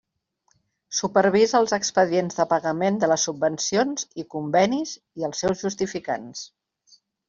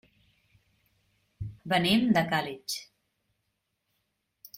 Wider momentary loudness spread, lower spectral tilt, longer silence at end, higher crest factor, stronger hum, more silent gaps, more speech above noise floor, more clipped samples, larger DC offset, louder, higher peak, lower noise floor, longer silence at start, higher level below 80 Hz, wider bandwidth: second, 12 LU vs 18 LU; about the same, -4 dB/octave vs -4.5 dB/octave; second, 0.8 s vs 1.75 s; about the same, 20 dB vs 20 dB; neither; neither; second, 47 dB vs 53 dB; neither; neither; first, -23 LUFS vs -27 LUFS; first, -4 dBFS vs -12 dBFS; second, -70 dBFS vs -80 dBFS; second, 0.9 s vs 1.4 s; about the same, -62 dBFS vs -60 dBFS; second, 7.6 kHz vs 16 kHz